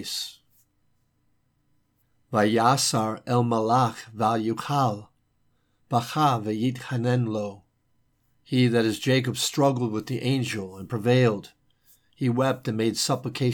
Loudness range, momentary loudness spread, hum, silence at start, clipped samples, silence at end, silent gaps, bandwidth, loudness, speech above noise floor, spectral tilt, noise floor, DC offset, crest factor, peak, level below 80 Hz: 3 LU; 9 LU; none; 0 s; under 0.1%; 0 s; none; 18 kHz; -25 LUFS; 45 dB; -5 dB/octave; -69 dBFS; under 0.1%; 20 dB; -6 dBFS; -68 dBFS